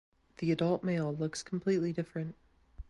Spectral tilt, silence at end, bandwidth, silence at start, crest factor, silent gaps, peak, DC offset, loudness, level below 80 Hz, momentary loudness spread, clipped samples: -6.5 dB/octave; 0.1 s; 11.5 kHz; 0.4 s; 16 dB; none; -18 dBFS; under 0.1%; -34 LUFS; -60 dBFS; 8 LU; under 0.1%